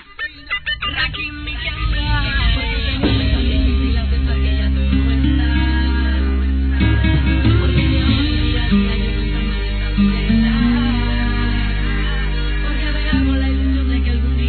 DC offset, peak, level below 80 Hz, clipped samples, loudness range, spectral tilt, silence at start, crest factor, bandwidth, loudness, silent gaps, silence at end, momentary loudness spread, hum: 0.2%; -4 dBFS; -18 dBFS; under 0.1%; 3 LU; -9.5 dB/octave; 0 s; 12 dB; 4.5 kHz; -18 LUFS; none; 0 s; 6 LU; none